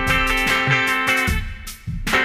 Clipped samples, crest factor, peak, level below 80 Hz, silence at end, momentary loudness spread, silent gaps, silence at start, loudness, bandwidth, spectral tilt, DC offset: under 0.1%; 16 dB; -4 dBFS; -30 dBFS; 0 s; 15 LU; none; 0 s; -18 LUFS; 19 kHz; -3.5 dB/octave; under 0.1%